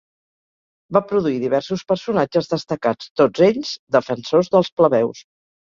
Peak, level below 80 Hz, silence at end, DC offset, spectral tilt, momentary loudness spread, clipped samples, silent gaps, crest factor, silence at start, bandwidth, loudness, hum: -2 dBFS; -58 dBFS; 0.55 s; under 0.1%; -6.5 dB/octave; 7 LU; under 0.1%; 3.10-3.15 s, 3.79-3.87 s, 4.72-4.77 s; 18 dB; 0.9 s; 7.4 kHz; -19 LUFS; none